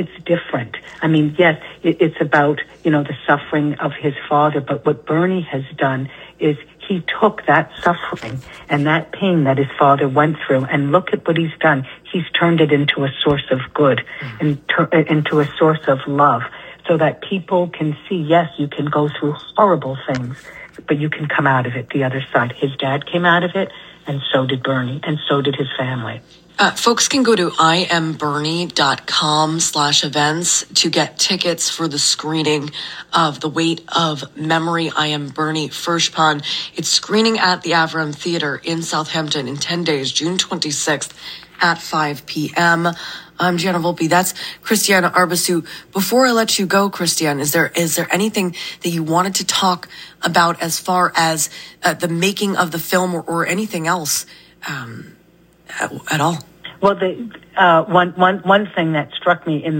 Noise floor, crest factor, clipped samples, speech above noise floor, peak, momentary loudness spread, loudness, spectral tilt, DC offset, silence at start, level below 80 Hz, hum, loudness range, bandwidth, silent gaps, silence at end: -51 dBFS; 16 dB; under 0.1%; 34 dB; 0 dBFS; 10 LU; -17 LUFS; -4 dB/octave; under 0.1%; 0 s; -56 dBFS; none; 4 LU; 16.5 kHz; none; 0 s